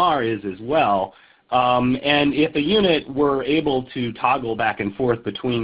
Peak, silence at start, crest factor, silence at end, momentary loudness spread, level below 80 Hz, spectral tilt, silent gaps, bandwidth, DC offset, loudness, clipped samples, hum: -4 dBFS; 0 s; 16 dB; 0 s; 6 LU; -50 dBFS; -10.5 dB/octave; none; 5.2 kHz; under 0.1%; -20 LUFS; under 0.1%; none